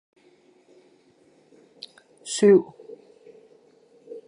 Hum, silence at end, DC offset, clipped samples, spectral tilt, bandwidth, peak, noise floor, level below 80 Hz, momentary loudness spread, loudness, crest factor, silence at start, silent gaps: none; 0.1 s; under 0.1%; under 0.1%; -5 dB/octave; 11 kHz; -6 dBFS; -59 dBFS; -80 dBFS; 29 LU; -20 LUFS; 22 dB; 2.25 s; none